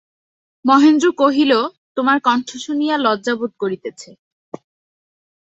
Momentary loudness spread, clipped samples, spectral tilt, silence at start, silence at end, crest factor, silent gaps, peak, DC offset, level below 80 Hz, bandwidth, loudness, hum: 20 LU; under 0.1%; -4 dB/octave; 0.65 s; 1.55 s; 16 dB; 1.78-1.95 s; -2 dBFS; under 0.1%; -66 dBFS; 8 kHz; -16 LUFS; none